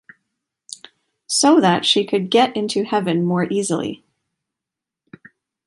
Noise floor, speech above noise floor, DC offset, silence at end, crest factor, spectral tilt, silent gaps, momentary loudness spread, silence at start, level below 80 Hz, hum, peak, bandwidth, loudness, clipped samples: -86 dBFS; 68 dB; under 0.1%; 1.7 s; 18 dB; -4 dB/octave; none; 23 LU; 1.3 s; -66 dBFS; none; -2 dBFS; 11.5 kHz; -18 LUFS; under 0.1%